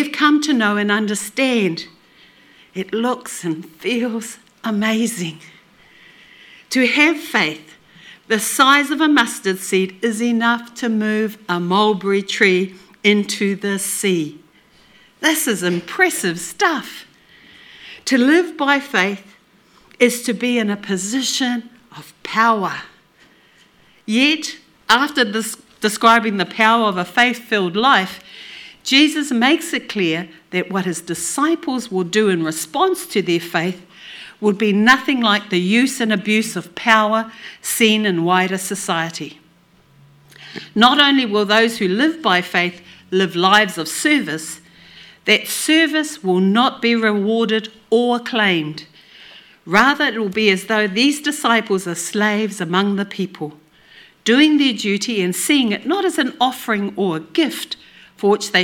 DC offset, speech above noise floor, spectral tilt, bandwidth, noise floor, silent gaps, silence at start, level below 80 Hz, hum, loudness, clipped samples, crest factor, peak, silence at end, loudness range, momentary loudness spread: under 0.1%; 36 dB; -3.5 dB/octave; 19 kHz; -53 dBFS; none; 0 s; -64 dBFS; none; -17 LUFS; under 0.1%; 18 dB; 0 dBFS; 0 s; 4 LU; 13 LU